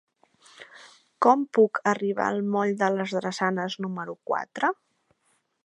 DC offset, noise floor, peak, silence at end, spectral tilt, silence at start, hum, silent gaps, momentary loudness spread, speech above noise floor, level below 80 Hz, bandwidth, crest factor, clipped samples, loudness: under 0.1%; -71 dBFS; -6 dBFS; 0.9 s; -5.5 dB/octave; 0.6 s; none; none; 13 LU; 46 dB; -78 dBFS; 10.5 kHz; 22 dB; under 0.1%; -25 LUFS